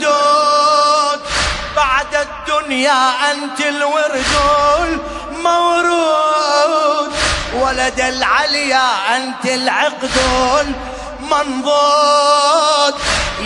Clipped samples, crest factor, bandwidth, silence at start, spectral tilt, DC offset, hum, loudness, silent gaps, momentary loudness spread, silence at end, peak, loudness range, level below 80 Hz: under 0.1%; 14 dB; 11 kHz; 0 s; -2.5 dB/octave; under 0.1%; none; -14 LUFS; none; 7 LU; 0 s; 0 dBFS; 2 LU; -34 dBFS